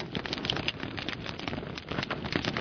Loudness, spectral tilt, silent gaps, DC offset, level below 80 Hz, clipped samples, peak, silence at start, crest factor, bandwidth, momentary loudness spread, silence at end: -33 LUFS; -5 dB/octave; none; under 0.1%; -52 dBFS; under 0.1%; -10 dBFS; 0 s; 24 dB; 5.4 kHz; 6 LU; 0 s